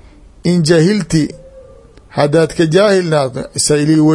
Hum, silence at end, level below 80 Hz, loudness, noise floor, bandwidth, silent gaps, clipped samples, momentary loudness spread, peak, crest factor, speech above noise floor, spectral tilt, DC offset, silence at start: none; 0 s; -42 dBFS; -13 LUFS; -40 dBFS; 11.5 kHz; none; under 0.1%; 8 LU; 0 dBFS; 14 dB; 28 dB; -5.5 dB/octave; under 0.1%; 0.45 s